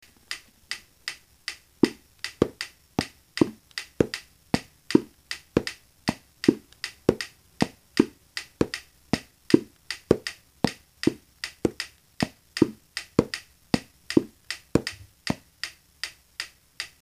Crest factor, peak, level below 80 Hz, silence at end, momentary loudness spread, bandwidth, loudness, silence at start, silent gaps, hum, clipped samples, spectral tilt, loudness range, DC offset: 28 dB; 0 dBFS; -52 dBFS; 0.15 s; 12 LU; 15.5 kHz; -29 LUFS; 0.3 s; none; none; under 0.1%; -5 dB/octave; 3 LU; under 0.1%